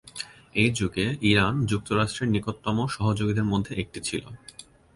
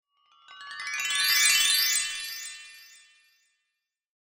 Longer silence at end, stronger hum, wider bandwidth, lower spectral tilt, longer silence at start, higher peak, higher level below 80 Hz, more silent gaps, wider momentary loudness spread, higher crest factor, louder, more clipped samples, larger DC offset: second, 0.35 s vs 1.55 s; neither; second, 11.5 kHz vs 16.5 kHz; first, -5.5 dB/octave vs 4.5 dB/octave; second, 0.05 s vs 0.5 s; about the same, -6 dBFS vs -8 dBFS; first, -48 dBFS vs -72 dBFS; neither; second, 14 LU vs 22 LU; about the same, 20 dB vs 22 dB; second, -26 LUFS vs -23 LUFS; neither; neither